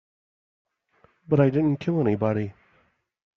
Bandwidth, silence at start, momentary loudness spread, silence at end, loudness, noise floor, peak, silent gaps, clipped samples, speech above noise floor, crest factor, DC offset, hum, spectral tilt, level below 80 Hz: 6.4 kHz; 1.3 s; 8 LU; 0.85 s; -23 LUFS; -66 dBFS; -6 dBFS; none; under 0.1%; 44 dB; 20 dB; under 0.1%; none; -9 dB/octave; -60 dBFS